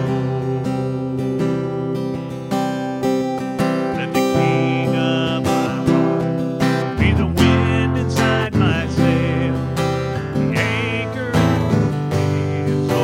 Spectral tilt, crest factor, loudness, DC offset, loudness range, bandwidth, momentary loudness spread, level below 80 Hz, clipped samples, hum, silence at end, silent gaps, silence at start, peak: -6.5 dB/octave; 18 dB; -19 LUFS; under 0.1%; 4 LU; 16 kHz; 6 LU; -36 dBFS; under 0.1%; none; 0 s; none; 0 s; 0 dBFS